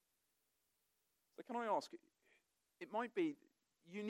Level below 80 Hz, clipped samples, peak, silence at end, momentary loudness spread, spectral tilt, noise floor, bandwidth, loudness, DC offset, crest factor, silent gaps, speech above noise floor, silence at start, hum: under -90 dBFS; under 0.1%; -28 dBFS; 0 s; 19 LU; -5.5 dB/octave; -86 dBFS; 15.5 kHz; -44 LUFS; under 0.1%; 20 dB; none; 43 dB; 1.4 s; none